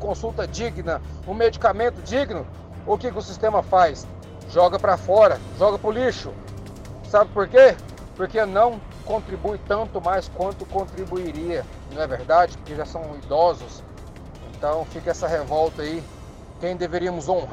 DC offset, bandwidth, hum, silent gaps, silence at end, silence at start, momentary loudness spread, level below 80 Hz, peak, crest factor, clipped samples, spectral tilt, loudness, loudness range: under 0.1%; 10.5 kHz; none; none; 0 s; 0 s; 20 LU; -40 dBFS; -4 dBFS; 18 dB; under 0.1%; -5.5 dB/octave; -22 LUFS; 7 LU